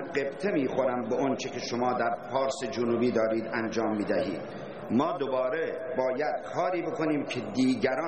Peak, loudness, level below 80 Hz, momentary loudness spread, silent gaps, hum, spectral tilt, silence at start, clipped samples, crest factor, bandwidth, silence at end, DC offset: -12 dBFS; -29 LUFS; -66 dBFS; 5 LU; none; none; -5.5 dB/octave; 0 s; under 0.1%; 16 dB; 8.8 kHz; 0 s; 0.2%